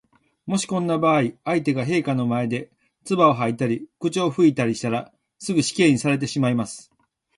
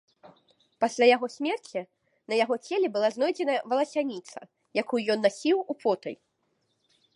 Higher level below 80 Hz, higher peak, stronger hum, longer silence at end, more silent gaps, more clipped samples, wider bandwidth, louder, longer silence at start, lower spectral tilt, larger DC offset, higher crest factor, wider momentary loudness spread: first, -62 dBFS vs -84 dBFS; about the same, -4 dBFS vs -6 dBFS; neither; second, 0.55 s vs 1 s; neither; neither; about the same, 11.5 kHz vs 11.5 kHz; first, -22 LUFS vs -27 LUFS; first, 0.45 s vs 0.25 s; first, -5.5 dB/octave vs -4 dB/octave; neither; about the same, 18 dB vs 22 dB; second, 10 LU vs 15 LU